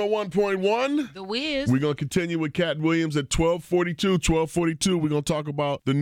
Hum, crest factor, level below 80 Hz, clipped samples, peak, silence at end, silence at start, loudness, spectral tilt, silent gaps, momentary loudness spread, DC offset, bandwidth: none; 14 dB; -42 dBFS; under 0.1%; -10 dBFS; 0 s; 0 s; -24 LUFS; -5.5 dB/octave; none; 4 LU; under 0.1%; 16.5 kHz